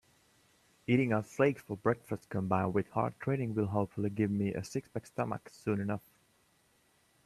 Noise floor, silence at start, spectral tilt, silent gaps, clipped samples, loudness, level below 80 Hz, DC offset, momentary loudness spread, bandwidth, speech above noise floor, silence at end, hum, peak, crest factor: -70 dBFS; 0.9 s; -7.5 dB/octave; none; under 0.1%; -34 LUFS; -68 dBFS; under 0.1%; 9 LU; 13.5 kHz; 37 dB; 1.25 s; none; -14 dBFS; 20 dB